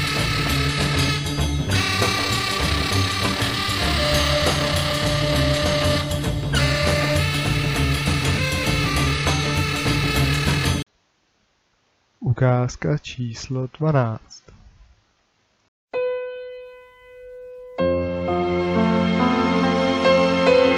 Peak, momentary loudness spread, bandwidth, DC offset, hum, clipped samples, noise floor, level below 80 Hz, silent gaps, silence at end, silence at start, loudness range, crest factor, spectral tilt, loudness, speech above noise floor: -6 dBFS; 9 LU; 16 kHz; under 0.1%; none; under 0.1%; -66 dBFS; -34 dBFS; 15.68-15.88 s; 0 s; 0 s; 8 LU; 16 dB; -5 dB/octave; -20 LUFS; 43 dB